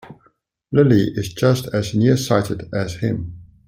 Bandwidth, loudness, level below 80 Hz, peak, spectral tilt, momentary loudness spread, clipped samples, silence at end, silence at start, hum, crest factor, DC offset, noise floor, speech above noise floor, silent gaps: 16 kHz; -19 LUFS; -48 dBFS; -2 dBFS; -6.5 dB/octave; 10 LU; under 0.1%; 0.25 s; 0.05 s; none; 18 dB; under 0.1%; -60 dBFS; 42 dB; none